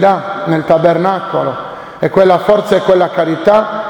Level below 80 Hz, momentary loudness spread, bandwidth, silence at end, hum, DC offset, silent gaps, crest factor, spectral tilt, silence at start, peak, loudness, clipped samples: -48 dBFS; 9 LU; 18 kHz; 0 s; none; under 0.1%; none; 12 dB; -7 dB/octave; 0 s; 0 dBFS; -12 LUFS; 0.3%